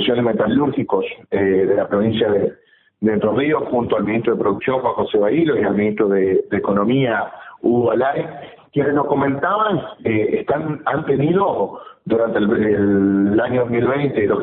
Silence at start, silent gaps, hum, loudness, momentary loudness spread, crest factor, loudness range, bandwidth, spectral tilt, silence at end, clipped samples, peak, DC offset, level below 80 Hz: 0 s; none; none; -18 LUFS; 6 LU; 14 dB; 2 LU; 4.1 kHz; -12 dB/octave; 0 s; under 0.1%; -4 dBFS; under 0.1%; -52 dBFS